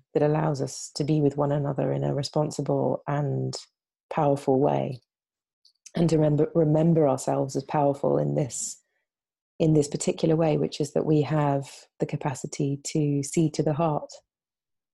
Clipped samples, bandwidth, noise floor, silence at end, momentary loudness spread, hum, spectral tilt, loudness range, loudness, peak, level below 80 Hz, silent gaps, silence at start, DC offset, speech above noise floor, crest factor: under 0.1%; 12 kHz; -89 dBFS; 0.75 s; 10 LU; none; -6.5 dB/octave; 3 LU; -25 LUFS; -10 dBFS; -58 dBFS; 4.00-4.09 s, 5.53-5.62 s, 9.41-9.59 s; 0.15 s; under 0.1%; 64 dB; 16 dB